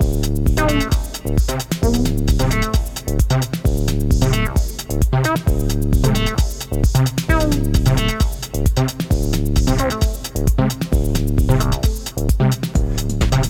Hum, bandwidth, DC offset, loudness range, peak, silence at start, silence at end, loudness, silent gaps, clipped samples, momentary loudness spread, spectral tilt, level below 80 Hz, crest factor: none; 17.5 kHz; under 0.1%; 1 LU; 0 dBFS; 0 s; 0 s; -19 LUFS; none; under 0.1%; 4 LU; -5.5 dB/octave; -20 dBFS; 16 dB